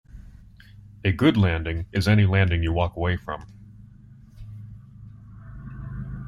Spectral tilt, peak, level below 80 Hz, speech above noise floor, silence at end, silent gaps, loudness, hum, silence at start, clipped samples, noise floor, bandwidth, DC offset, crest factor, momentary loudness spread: -7.5 dB/octave; -6 dBFS; -42 dBFS; 26 dB; 0 s; none; -23 LUFS; none; 0.15 s; under 0.1%; -48 dBFS; 12.5 kHz; under 0.1%; 20 dB; 26 LU